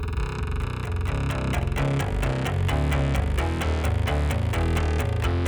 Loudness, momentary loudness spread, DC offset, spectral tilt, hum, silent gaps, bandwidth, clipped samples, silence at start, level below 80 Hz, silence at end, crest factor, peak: -26 LUFS; 5 LU; under 0.1%; -6.5 dB/octave; none; none; over 20 kHz; under 0.1%; 0 s; -28 dBFS; 0 s; 12 dB; -12 dBFS